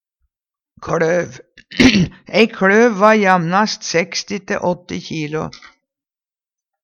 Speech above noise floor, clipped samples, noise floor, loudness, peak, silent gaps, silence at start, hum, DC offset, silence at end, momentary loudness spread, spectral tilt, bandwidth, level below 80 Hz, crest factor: over 74 dB; under 0.1%; under -90 dBFS; -15 LUFS; 0 dBFS; none; 0.8 s; none; under 0.1%; 1.35 s; 14 LU; -4.5 dB/octave; 9.8 kHz; -44 dBFS; 18 dB